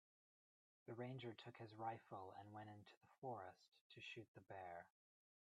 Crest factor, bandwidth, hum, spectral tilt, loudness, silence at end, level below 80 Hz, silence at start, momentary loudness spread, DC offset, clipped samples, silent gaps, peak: 20 dB; 9.4 kHz; none; -6.5 dB/octave; -57 LUFS; 0.5 s; under -90 dBFS; 0.85 s; 9 LU; under 0.1%; under 0.1%; 2.97-3.01 s, 3.18-3.22 s, 3.68-3.72 s, 3.81-3.90 s, 4.28-4.34 s; -38 dBFS